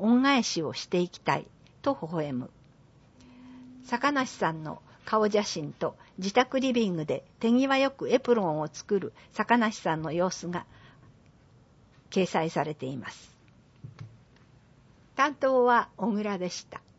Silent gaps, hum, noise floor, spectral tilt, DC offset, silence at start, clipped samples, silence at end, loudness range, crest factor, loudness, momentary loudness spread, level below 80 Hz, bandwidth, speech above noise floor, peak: none; none; -58 dBFS; -5 dB/octave; under 0.1%; 0 s; under 0.1%; 0.2 s; 7 LU; 22 dB; -28 LUFS; 15 LU; -66 dBFS; 8 kHz; 31 dB; -8 dBFS